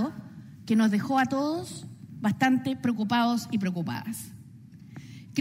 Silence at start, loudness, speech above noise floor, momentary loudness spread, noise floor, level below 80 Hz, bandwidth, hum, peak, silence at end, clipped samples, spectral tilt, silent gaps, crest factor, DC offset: 0 s; -27 LUFS; 22 dB; 21 LU; -48 dBFS; -68 dBFS; 16 kHz; none; -10 dBFS; 0 s; under 0.1%; -5.5 dB/octave; none; 18 dB; under 0.1%